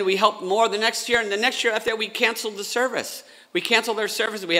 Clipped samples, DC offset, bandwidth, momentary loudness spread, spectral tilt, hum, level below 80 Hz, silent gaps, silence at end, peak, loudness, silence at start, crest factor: under 0.1%; under 0.1%; 16 kHz; 8 LU; -2 dB/octave; none; -64 dBFS; none; 0 s; -4 dBFS; -22 LUFS; 0 s; 20 dB